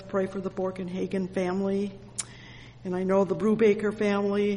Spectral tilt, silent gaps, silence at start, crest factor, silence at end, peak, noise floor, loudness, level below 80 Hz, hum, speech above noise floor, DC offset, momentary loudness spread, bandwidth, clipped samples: -6 dB/octave; none; 0 s; 16 dB; 0 s; -12 dBFS; -47 dBFS; -28 LUFS; -58 dBFS; none; 20 dB; under 0.1%; 13 LU; 11.5 kHz; under 0.1%